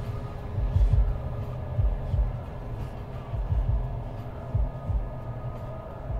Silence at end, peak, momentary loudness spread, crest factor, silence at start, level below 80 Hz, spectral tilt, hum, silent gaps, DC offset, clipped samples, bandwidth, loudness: 0 s; -12 dBFS; 11 LU; 16 dB; 0 s; -30 dBFS; -9.5 dB/octave; none; none; under 0.1%; under 0.1%; 4.8 kHz; -31 LUFS